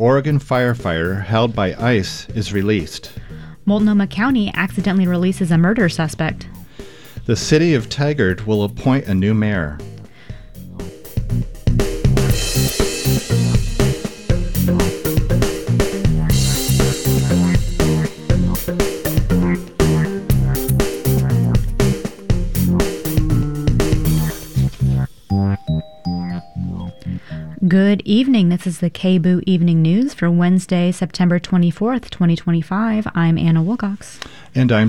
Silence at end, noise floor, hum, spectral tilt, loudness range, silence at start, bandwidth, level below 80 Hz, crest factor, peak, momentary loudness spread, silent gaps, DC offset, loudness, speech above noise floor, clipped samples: 0 s; -37 dBFS; none; -6 dB/octave; 4 LU; 0 s; 19.5 kHz; -28 dBFS; 16 dB; -2 dBFS; 12 LU; none; 0.8%; -18 LUFS; 21 dB; under 0.1%